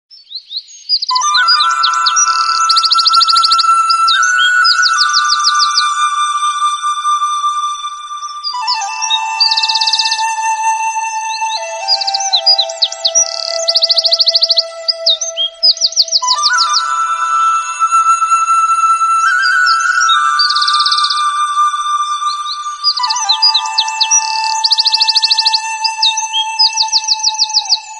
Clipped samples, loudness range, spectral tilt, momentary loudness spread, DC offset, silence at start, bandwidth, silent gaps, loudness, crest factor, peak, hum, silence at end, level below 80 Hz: under 0.1%; 5 LU; 6.5 dB/octave; 8 LU; under 0.1%; 0.15 s; 11.5 kHz; none; -10 LUFS; 12 dB; 0 dBFS; none; 0 s; -64 dBFS